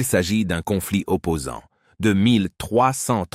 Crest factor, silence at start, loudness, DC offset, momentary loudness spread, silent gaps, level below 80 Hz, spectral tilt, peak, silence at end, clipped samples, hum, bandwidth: 16 dB; 0 s; -21 LUFS; under 0.1%; 8 LU; none; -46 dBFS; -5 dB/octave; -6 dBFS; 0.1 s; under 0.1%; none; 16 kHz